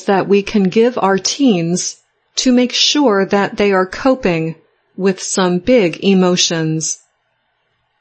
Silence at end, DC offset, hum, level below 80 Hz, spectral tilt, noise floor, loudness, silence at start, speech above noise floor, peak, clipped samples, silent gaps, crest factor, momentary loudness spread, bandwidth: 1.05 s; under 0.1%; none; -48 dBFS; -4 dB/octave; -65 dBFS; -14 LUFS; 0 s; 51 dB; 0 dBFS; under 0.1%; none; 14 dB; 8 LU; 8.8 kHz